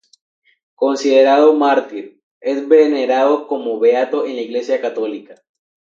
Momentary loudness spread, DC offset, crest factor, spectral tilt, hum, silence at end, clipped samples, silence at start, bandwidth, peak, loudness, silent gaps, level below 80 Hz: 13 LU; under 0.1%; 16 dB; -3.5 dB/octave; none; 0.6 s; under 0.1%; 0.8 s; 7.6 kHz; 0 dBFS; -15 LUFS; 2.23-2.41 s; -78 dBFS